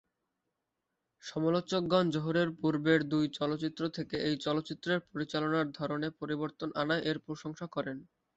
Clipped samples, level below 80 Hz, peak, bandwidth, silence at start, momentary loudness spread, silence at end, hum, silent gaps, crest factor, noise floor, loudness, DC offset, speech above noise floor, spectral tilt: under 0.1%; -68 dBFS; -14 dBFS; 8 kHz; 1.25 s; 10 LU; 0.35 s; none; none; 20 dB; -86 dBFS; -33 LUFS; under 0.1%; 53 dB; -6.5 dB/octave